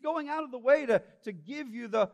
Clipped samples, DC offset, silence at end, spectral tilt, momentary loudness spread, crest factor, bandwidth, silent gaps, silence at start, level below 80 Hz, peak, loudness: under 0.1%; under 0.1%; 0.05 s; -6 dB/octave; 16 LU; 20 dB; 9.2 kHz; none; 0.05 s; -78 dBFS; -10 dBFS; -30 LUFS